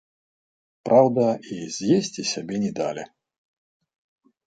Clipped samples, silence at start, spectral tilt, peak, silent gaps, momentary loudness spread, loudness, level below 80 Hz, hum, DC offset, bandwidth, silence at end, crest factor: under 0.1%; 0.85 s; -5 dB/octave; -4 dBFS; none; 16 LU; -23 LUFS; -68 dBFS; none; under 0.1%; 9.2 kHz; 1.45 s; 22 dB